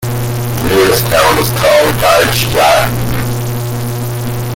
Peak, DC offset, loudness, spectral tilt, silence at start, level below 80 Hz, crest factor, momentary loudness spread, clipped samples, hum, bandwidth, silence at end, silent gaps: 0 dBFS; under 0.1%; -11 LUFS; -4.5 dB/octave; 0 s; -30 dBFS; 12 dB; 9 LU; under 0.1%; none; 17 kHz; 0 s; none